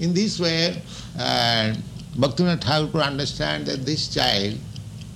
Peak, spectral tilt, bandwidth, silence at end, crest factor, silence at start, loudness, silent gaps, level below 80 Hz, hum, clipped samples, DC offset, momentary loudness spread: -6 dBFS; -4.5 dB/octave; 15 kHz; 0 s; 16 dB; 0 s; -22 LUFS; none; -46 dBFS; none; under 0.1%; under 0.1%; 13 LU